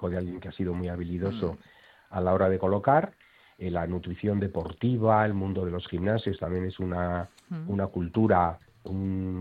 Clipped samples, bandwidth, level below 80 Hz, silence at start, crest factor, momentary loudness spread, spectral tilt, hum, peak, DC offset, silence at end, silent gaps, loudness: under 0.1%; 5 kHz; -52 dBFS; 0 s; 18 dB; 12 LU; -9.5 dB/octave; none; -10 dBFS; under 0.1%; 0 s; none; -29 LUFS